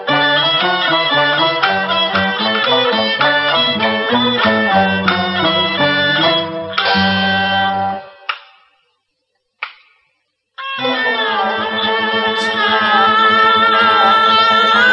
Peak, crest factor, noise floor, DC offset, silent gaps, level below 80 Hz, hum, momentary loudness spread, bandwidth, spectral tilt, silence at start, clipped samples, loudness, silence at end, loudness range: 0 dBFS; 14 dB; -69 dBFS; under 0.1%; none; -56 dBFS; none; 10 LU; 10 kHz; -5 dB/octave; 0 s; under 0.1%; -13 LUFS; 0 s; 9 LU